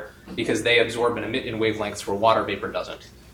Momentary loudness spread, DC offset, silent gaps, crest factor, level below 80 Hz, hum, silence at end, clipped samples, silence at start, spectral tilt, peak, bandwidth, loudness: 13 LU; under 0.1%; none; 20 dB; -52 dBFS; none; 0 s; under 0.1%; 0 s; -4 dB/octave; -6 dBFS; 18 kHz; -23 LUFS